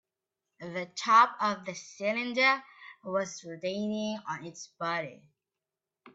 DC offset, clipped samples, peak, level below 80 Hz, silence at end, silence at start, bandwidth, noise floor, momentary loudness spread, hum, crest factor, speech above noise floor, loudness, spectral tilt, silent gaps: under 0.1%; under 0.1%; -10 dBFS; -80 dBFS; 0.05 s; 0.6 s; 8 kHz; -90 dBFS; 19 LU; none; 22 dB; 59 dB; -30 LUFS; -3.5 dB/octave; none